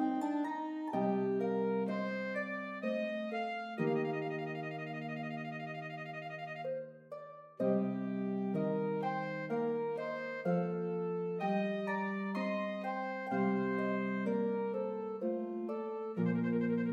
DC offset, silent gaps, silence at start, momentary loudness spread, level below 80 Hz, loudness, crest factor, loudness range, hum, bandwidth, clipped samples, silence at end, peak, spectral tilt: under 0.1%; none; 0 s; 8 LU; -90 dBFS; -37 LUFS; 16 dB; 4 LU; none; 7.6 kHz; under 0.1%; 0 s; -20 dBFS; -8.5 dB/octave